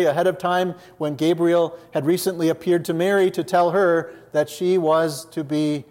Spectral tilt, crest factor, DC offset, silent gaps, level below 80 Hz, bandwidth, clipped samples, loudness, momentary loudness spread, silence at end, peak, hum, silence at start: -5.5 dB/octave; 14 dB; under 0.1%; none; -68 dBFS; 16.5 kHz; under 0.1%; -21 LUFS; 7 LU; 0.1 s; -6 dBFS; none; 0 s